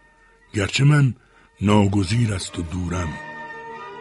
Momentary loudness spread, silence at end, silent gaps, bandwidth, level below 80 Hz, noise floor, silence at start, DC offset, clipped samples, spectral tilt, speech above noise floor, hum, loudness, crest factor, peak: 18 LU; 0 s; none; 11.5 kHz; -44 dBFS; -54 dBFS; 0.55 s; under 0.1%; under 0.1%; -6 dB/octave; 35 dB; none; -21 LUFS; 20 dB; -2 dBFS